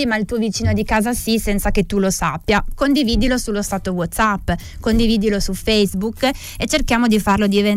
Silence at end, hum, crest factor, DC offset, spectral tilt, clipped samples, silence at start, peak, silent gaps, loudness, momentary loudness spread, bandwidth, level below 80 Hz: 0 s; none; 12 dB; under 0.1%; -4.5 dB/octave; under 0.1%; 0 s; -6 dBFS; none; -18 LUFS; 6 LU; 16.5 kHz; -28 dBFS